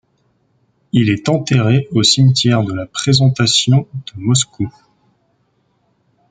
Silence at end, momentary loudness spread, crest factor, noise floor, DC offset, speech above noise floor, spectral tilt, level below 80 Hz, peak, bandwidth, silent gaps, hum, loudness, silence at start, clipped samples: 1.6 s; 10 LU; 16 dB; -61 dBFS; under 0.1%; 48 dB; -4.5 dB/octave; -50 dBFS; 0 dBFS; 9.4 kHz; none; none; -14 LUFS; 0.95 s; under 0.1%